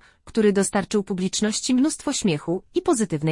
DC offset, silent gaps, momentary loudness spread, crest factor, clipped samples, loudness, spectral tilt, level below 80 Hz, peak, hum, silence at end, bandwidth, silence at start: under 0.1%; none; 5 LU; 16 dB; under 0.1%; -23 LUFS; -4.5 dB/octave; -54 dBFS; -6 dBFS; none; 0 s; 11.5 kHz; 0.25 s